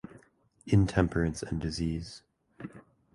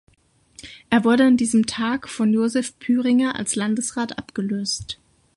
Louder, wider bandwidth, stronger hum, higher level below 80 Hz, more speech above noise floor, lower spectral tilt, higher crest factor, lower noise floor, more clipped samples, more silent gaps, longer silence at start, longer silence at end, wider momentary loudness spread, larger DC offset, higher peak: second, -30 LUFS vs -21 LUFS; about the same, 11.5 kHz vs 11.5 kHz; neither; first, -44 dBFS vs -56 dBFS; second, 35 dB vs 39 dB; first, -6.5 dB/octave vs -4 dB/octave; first, 22 dB vs 16 dB; first, -63 dBFS vs -59 dBFS; neither; neither; about the same, 0.65 s vs 0.6 s; about the same, 0.35 s vs 0.45 s; first, 23 LU vs 12 LU; neither; second, -10 dBFS vs -4 dBFS